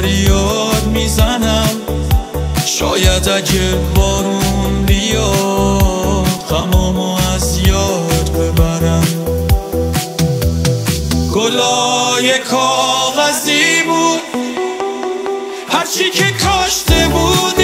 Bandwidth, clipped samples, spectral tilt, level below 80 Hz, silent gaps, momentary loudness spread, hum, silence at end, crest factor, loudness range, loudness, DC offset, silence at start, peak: 16.5 kHz; under 0.1%; -4 dB/octave; -20 dBFS; none; 5 LU; none; 0 s; 14 dB; 2 LU; -14 LUFS; under 0.1%; 0 s; 0 dBFS